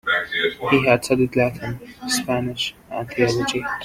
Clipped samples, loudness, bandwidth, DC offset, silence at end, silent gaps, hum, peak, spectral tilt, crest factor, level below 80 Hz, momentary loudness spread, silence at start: under 0.1%; -21 LUFS; 16.5 kHz; under 0.1%; 0 s; none; none; -2 dBFS; -4.5 dB/octave; 20 dB; -50 dBFS; 12 LU; 0.05 s